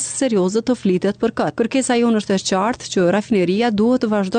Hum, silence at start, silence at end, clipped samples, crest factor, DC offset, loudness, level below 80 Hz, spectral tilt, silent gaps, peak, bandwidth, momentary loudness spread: none; 0 s; 0 s; under 0.1%; 10 dB; under 0.1%; -18 LUFS; -54 dBFS; -5 dB/octave; none; -8 dBFS; 9.6 kHz; 4 LU